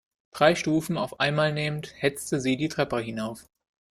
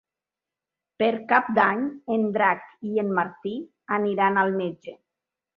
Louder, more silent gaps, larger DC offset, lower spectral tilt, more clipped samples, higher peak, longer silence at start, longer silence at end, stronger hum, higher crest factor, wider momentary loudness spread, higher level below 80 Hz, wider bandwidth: about the same, -26 LUFS vs -24 LUFS; neither; neither; second, -5 dB/octave vs -8.5 dB/octave; neither; about the same, -6 dBFS vs -4 dBFS; second, 0.35 s vs 1 s; about the same, 0.55 s vs 0.6 s; neither; about the same, 22 dB vs 22 dB; about the same, 11 LU vs 12 LU; first, -60 dBFS vs -72 dBFS; first, 15.5 kHz vs 5.6 kHz